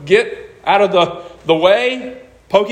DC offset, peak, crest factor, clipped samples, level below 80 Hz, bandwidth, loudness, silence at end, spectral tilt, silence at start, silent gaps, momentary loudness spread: under 0.1%; 0 dBFS; 14 dB; under 0.1%; -52 dBFS; 10 kHz; -15 LUFS; 0 s; -5 dB/octave; 0 s; none; 13 LU